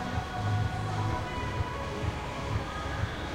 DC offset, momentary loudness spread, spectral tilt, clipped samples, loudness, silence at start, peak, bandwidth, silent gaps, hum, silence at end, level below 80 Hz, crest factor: under 0.1%; 3 LU; -6 dB/octave; under 0.1%; -33 LUFS; 0 s; -18 dBFS; 12.5 kHz; none; none; 0 s; -42 dBFS; 14 dB